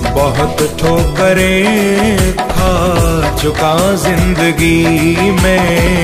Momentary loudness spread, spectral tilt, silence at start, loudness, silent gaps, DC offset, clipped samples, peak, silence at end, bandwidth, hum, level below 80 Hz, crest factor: 3 LU; -5 dB/octave; 0 s; -11 LUFS; none; under 0.1%; under 0.1%; 0 dBFS; 0 s; 15.5 kHz; none; -20 dBFS; 10 dB